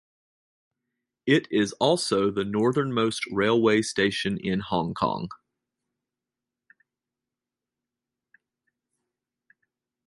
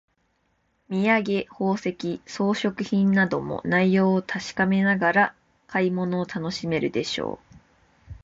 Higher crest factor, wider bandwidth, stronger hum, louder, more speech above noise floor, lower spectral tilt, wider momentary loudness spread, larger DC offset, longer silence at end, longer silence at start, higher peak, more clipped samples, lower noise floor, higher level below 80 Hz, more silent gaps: first, 22 dB vs 16 dB; first, 11.5 kHz vs 7.8 kHz; neither; about the same, -25 LUFS vs -24 LUFS; first, 64 dB vs 46 dB; second, -5 dB/octave vs -6.5 dB/octave; second, 6 LU vs 10 LU; neither; first, 4.7 s vs 0.1 s; first, 1.25 s vs 0.9 s; about the same, -6 dBFS vs -8 dBFS; neither; first, -89 dBFS vs -69 dBFS; about the same, -60 dBFS vs -56 dBFS; neither